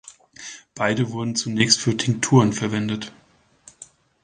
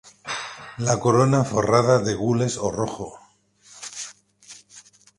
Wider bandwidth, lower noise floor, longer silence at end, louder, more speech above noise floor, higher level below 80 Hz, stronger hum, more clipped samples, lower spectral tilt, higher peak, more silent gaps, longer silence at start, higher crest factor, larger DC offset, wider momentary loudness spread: second, 10 kHz vs 11.5 kHz; second, -52 dBFS vs -56 dBFS; about the same, 0.4 s vs 0.4 s; about the same, -21 LUFS vs -22 LUFS; second, 32 dB vs 36 dB; about the same, -56 dBFS vs -54 dBFS; neither; neither; second, -4 dB/octave vs -5.5 dB/octave; about the same, -2 dBFS vs -2 dBFS; neither; second, 0.05 s vs 0.25 s; about the same, 22 dB vs 22 dB; neither; about the same, 20 LU vs 19 LU